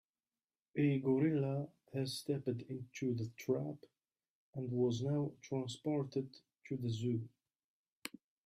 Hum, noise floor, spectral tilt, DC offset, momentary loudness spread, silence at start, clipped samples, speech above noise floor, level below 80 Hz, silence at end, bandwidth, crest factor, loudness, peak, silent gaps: none; under -90 dBFS; -7 dB/octave; under 0.1%; 17 LU; 0.75 s; under 0.1%; over 52 dB; -76 dBFS; 0.4 s; 14.5 kHz; 16 dB; -39 LUFS; -22 dBFS; 4.30-4.53 s, 7.64-7.85 s, 7.92-8.02 s